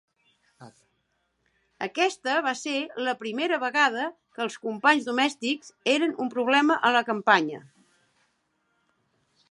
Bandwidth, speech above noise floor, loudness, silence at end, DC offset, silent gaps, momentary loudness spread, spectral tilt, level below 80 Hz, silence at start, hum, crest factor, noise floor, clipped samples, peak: 11.5 kHz; 49 dB; -25 LUFS; 1.9 s; under 0.1%; none; 11 LU; -3 dB/octave; -82 dBFS; 0.6 s; none; 22 dB; -74 dBFS; under 0.1%; -4 dBFS